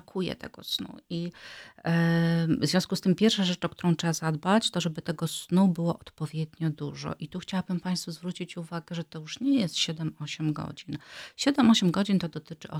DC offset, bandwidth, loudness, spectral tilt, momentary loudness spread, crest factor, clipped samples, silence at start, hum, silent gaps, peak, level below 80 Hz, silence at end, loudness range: under 0.1%; 15.5 kHz; -28 LUFS; -5.5 dB/octave; 14 LU; 20 dB; under 0.1%; 0.15 s; none; none; -10 dBFS; -64 dBFS; 0 s; 6 LU